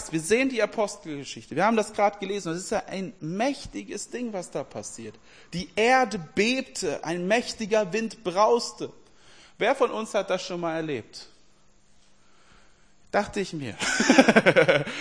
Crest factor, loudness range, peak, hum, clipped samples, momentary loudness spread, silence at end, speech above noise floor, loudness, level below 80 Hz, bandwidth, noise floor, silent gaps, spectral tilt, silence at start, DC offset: 26 dB; 8 LU; 0 dBFS; none; under 0.1%; 16 LU; 0 s; 36 dB; -25 LUFS; -58 dBFS; 10.5 kHz; -61 dBFS; none; -4 dB/octave; 0 s; 0.2%